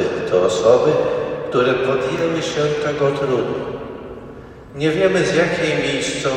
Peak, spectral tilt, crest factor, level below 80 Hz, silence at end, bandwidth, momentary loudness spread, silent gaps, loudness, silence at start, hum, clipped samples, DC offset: 0 dBFS; -5 dB/octave; 18 dB; -48 dBFS; 0 s; 10.5 kHz; 17 LU; none; -18 LUFS; 0 s; none; under 0.1%; under 0.1%